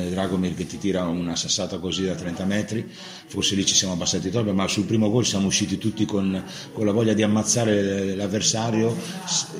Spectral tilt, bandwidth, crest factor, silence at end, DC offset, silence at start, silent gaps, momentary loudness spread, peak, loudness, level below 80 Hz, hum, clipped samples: -4 dB/octave; 16 kHz; 18 dB; 0 s; under 0.1%; 0 s; none; 8 LU; -6 dBFS; -23 LUFS; -54 dBFS; none; under 0.1%